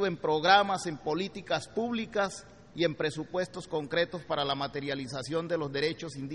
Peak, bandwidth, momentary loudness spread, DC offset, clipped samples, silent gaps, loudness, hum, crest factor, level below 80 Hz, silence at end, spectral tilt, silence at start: -8 dBFS; 11.5 kHz; 11 LU; under 0.1%; under 0.1%; none; -31 LUFS; none; 22 dB; -64 dBFS; 0 s; -4.5 dB/octave; 0 s